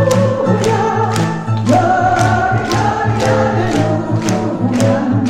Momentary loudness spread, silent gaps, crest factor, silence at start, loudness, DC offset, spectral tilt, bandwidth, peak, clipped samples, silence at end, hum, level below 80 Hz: 4 LU; none; 12 dB; 0 s; -14 LUFS; under 0.1%; -6.5 dB/octave; 13 kHz; -2 dBFS; under 0.1%; 0 s; none; -38 dBFS